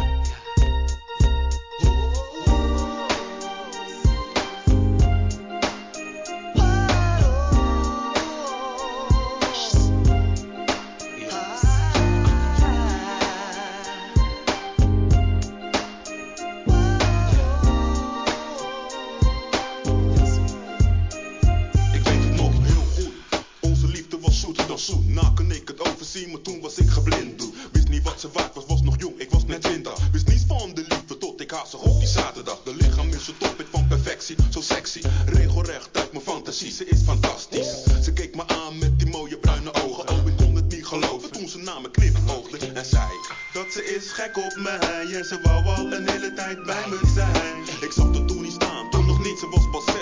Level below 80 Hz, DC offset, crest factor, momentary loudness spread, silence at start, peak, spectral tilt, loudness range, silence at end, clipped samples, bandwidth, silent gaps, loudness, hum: -24 dBFS; under 0.1%; 16 dB; 10 LU; 0 s; -6 dBFS; -5.5 dB/octave; 3 LU; 0 s; under 0.1%; 7.6 kHz; none; -23 LUFS; none